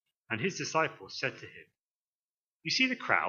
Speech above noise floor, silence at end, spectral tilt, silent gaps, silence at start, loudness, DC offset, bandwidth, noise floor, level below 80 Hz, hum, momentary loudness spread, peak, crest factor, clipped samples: over 58 dB; 0 s; -3 dB/octave; 1.87-2.60 s; 0.3 s; -32 LUFS; under 0.1%; 7.6 kHz; under -90 dBFS; -82 dBFS; none; 14 LU; -10 dBFS; 24 dB; under 0.1%